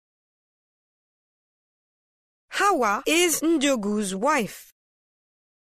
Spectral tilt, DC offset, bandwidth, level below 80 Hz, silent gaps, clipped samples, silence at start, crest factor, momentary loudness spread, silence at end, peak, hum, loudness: -3 dB/octave; under 0.1%; 15.5 kHz; -62 dBFS; none; under 0.1%; 2.5 s; 18 dB; 6 LU; 1.1 s; -8 dBFS; none; -22 LUFS